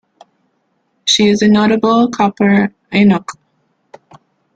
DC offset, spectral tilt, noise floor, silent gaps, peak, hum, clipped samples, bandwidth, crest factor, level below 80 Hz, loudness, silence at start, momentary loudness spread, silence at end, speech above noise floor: under 0.1%; -5 dB/octave; -63 dBFS; none; 0 dBFS; none; under 0.1%; 9 kHz; 14 dB; -52 dBFS; -12 LUFS; 1.05 s; 7 LU; 1.25 s; 52 dB